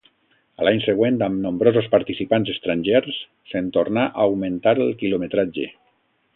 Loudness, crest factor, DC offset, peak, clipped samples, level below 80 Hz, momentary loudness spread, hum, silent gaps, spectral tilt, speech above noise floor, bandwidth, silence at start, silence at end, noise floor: -21 LUFS; 20 dB; under 0.1%; -2 dBFS; under 0.1%; -56 dBFS; 8 LU; none; none; -11 dB/octave; 45 dB; 4.1 kHz; 0.6 s; 0.65 s; -65 dBFS